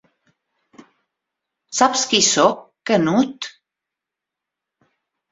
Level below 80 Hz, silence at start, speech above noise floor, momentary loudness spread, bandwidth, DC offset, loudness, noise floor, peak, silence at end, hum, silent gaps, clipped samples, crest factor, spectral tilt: -66 dBFS; 1.7 s; 68 dB; 15 LU; 8.4 kHz; under 0.1%; -17 LUFS; -85 dBFS; -2 dBFS; 1.8 s; none; none; under 0.1%; 20 dB; -2.5 dB/octave